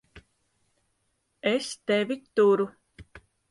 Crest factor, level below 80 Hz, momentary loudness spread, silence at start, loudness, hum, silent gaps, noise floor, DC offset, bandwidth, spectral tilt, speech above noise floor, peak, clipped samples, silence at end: 18 dB; -64 dBFS; 8 LU; 0.15 s; -26 LUFS; none; none; -75 dBFS; under 0.1%; 11.5 kHz; -4.5 dB/octave; 50 dB; -12 dBFS; under 0.1%; 0.35 s